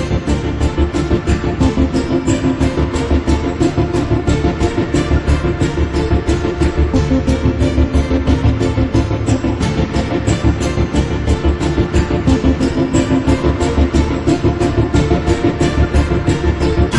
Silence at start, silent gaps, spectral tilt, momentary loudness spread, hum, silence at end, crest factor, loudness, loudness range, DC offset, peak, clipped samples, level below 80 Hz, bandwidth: 0 s; none; -7 dB/octave; 3 LU; none; 0 s; 14 dB; -15 LUFS; 1 LU; under 0.1%; 0 dBFS; under 0.1%; -20 dBFS; 11 kHz